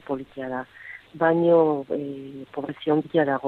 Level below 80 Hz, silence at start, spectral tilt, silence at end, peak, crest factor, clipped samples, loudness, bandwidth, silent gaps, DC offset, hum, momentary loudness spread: -66 dBFS; 0.1 s; -9 dB/octave; 0 s; -6 dBFS; 18 dB; under 0.1%; -24 LUFS; 4.3 kHz; none; under 0.1%; none; 19 LU